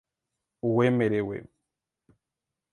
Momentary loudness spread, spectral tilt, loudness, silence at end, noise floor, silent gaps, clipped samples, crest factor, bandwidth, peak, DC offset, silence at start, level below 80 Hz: 12 LU; -8.5 dB/octave; -26 LUFS; 1.3 s; -87 dBFS; none; under 0.1%; 20 dB; 10 kHz; -10 dBFS; under 0.1%; 0.65 s; -64 dBFS